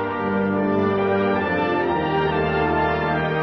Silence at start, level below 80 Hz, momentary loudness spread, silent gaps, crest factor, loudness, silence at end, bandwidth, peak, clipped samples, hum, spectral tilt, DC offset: 0 s; -42 dBFS; 1 LU; none; 12 dB; -21 LUFS; 0 s; 6.2 kHz; -8 dBFS; under 0.1%; none; -8.5 dB/octave; under 0.1%